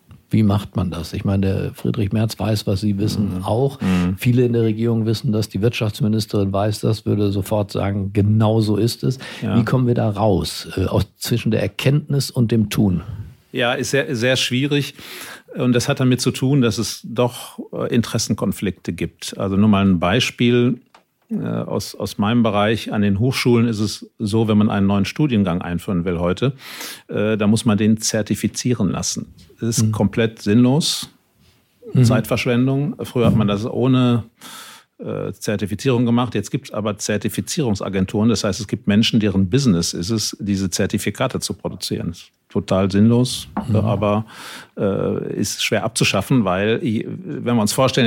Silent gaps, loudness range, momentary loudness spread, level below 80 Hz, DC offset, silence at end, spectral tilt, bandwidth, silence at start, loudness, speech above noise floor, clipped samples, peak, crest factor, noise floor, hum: none; 2 LU; 10 LU; -48 dBFS; under 0.1%; 0 s; -5.5 dB/octave; 17 kHz; 0.1 s; -19 LUFS; 38 dB; under 0.1%; -4 dBFS; 16 dB; -57 dBFS; none